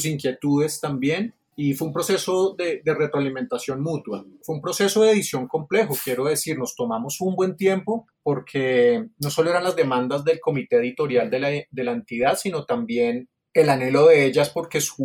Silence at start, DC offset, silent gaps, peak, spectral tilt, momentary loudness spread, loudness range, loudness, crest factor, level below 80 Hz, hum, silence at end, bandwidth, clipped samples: 0 s; under 0.1%; none; -4 dBFS; -5 dB/octave; 9 LU; 4 LU; -22 LUFS; 16 dB; -64 dBFS; none; 0 s; 19 kHz; under 0.1%